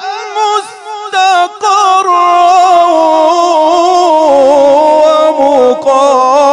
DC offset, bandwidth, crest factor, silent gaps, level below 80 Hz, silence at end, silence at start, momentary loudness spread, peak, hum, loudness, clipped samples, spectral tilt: under 0.1%; 12 kHz; 8 dB; none; -54 dBFS; 0 s; 0 s; 7 LU; 0 dBFS; none; -7 LUFS; 3%; -2 dB/octave